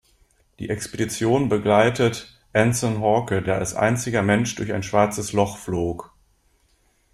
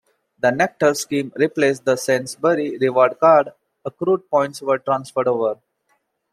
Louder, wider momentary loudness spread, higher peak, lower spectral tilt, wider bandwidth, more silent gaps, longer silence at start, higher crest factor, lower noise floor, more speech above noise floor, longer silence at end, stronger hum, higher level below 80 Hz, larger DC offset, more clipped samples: second, -22 LUFS vs -19 LUFS; about the same, 10 LU vs 9 LU; about the same, -4 dBFS vs -2 dBFS; about the same, -5.5 dB/octave vs -5 dB/octave; about the same, 15 kHz vs 15.5 kHz; neither; first, 0.6 s vs 0.45 s; about the same, 18 dB vs 18 dB; second, -63 dBFS vs -67 dBFS; second, 42 dB vs 49 dB; first, 1.1 s vs 0.8 s; neither; first, -50 dBFS vs -66 dBFS; neither; neither